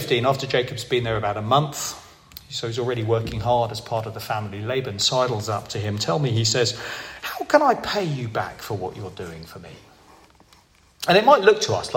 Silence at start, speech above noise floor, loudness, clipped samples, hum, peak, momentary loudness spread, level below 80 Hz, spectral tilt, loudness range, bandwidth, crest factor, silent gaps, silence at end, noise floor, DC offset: 0 s; 33 dB; -22 LUFS; under 0.1%; none; -2 dBFS; 14 LU; -52 dBFS; -4.5 dB/octave; 4 LU; 16.5 kHz; 22 dB; none; 0 s; -55 dBFS; under 0.1%